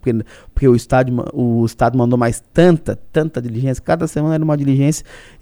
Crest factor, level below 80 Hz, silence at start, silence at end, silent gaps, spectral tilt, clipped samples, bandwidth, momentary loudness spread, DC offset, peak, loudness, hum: 16 dB; -34 dBFS; 0.05 s; 0.2 s; none; -7.5 dB/octave; under 0.1%; over 20 kHz; 7 LU; under 0.1%; 0 dBFS; -16 LUFS; none